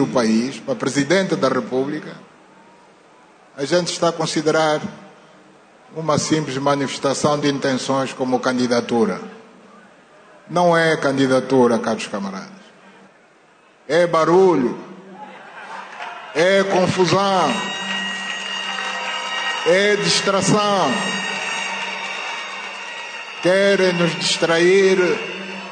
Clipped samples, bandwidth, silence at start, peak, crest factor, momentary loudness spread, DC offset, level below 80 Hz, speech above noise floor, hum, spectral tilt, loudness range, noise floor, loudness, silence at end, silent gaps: under 0.1%; 9.6 kHz; 0 s; -4 dBFS; 14 dB; 14 LU; under 0.1%; -64 dBFS; 34 dB; none; -4 dB/octave; 4 LU; -52 dBFS; -19 LUFS; 0 s; none